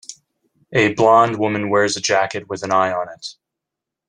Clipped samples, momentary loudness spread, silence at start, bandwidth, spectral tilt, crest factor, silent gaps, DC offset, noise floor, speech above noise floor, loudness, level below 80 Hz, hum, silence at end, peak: under 0.1%; 17 LU; 0.1 s; 10.5 kHz; -4 dB/octave; 18 dB; none; under 0.1%; -84 dBFS; 66 dB; -17 LUFS; -60 dBFS; none; 0.75 s; -2 dBFS